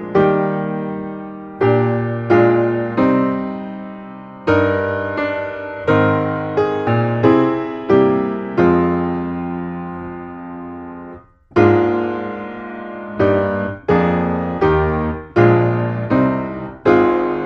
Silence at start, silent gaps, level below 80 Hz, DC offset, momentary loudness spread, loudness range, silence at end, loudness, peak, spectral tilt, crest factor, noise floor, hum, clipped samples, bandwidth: 0 s; none; -44 dBFS; under 0.1%; 16 LU; 4 LU; 0 s; -17 LUFS; 0 dBFS; -9.5 dB/octave; 16 dB; -39 dBFS; none; under 0.1%; 6.2 kHz